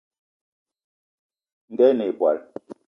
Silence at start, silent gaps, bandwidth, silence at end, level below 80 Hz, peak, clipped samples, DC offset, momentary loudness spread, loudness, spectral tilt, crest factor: 1.7 s; none; 5.6 kHz; 0.25 s; -78 dBFS; -6 dBFS; under 0.1%; under 0.1%; 21 LU; -21 LUFS; -8 dB/octave; 20 dB